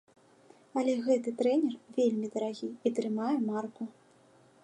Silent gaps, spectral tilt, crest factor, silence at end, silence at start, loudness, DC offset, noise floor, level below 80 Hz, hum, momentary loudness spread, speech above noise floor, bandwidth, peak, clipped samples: none; -6 dB/octave; 18 dB; 0.75 s; 0.75 s; -31 LUFS; under 0.1%; -62 dBFS; -86 dBFS; none; 9 LU; 31 dB; 10.5 kHz; -14 dBFS; under 0.1%